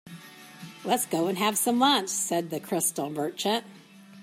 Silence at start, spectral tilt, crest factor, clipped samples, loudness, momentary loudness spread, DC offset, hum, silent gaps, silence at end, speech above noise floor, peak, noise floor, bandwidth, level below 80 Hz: 0.05 s; -3 dB/octave; 20 dB; under 0.1%; -26 LUFS; 22 LU; under 0.1%; none; none; 0 s; 20 dB; -8 dBFS; -46 dBFS; 16 kHz; -80 dBFS